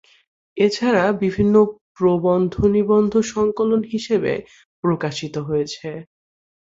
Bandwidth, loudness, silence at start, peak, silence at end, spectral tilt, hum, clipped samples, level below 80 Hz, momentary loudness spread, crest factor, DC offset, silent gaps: 7.8 kHz; -19 LUFS; 0.55 s; -2 dBFS; 0.65 s; -6.5 dB/octave; none; under 0.1%; -46 dBFS; 11 LU; 16 dB; under 0.1%; 1.81-1.95 s, 4.65-4.83 s